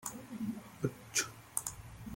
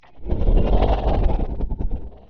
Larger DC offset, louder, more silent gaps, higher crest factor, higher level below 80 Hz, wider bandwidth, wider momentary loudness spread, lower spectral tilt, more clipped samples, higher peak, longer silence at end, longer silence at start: neither; second, -39 LUFS vs -23 LUFS; neither; first, 28 dB vs 12 dB; second, -62 dBFS vs -22 dBFS; first, 17 kHz vs 4.8 kHz; about the same, 9 LU vs 10 LU; second, -3 dB/octave vs -7.5 dB/octave; neither; second, -14 dBFS vs -6 dBFS; about the same, 0 s vs 0 s; about the same, 0 s vs 0 s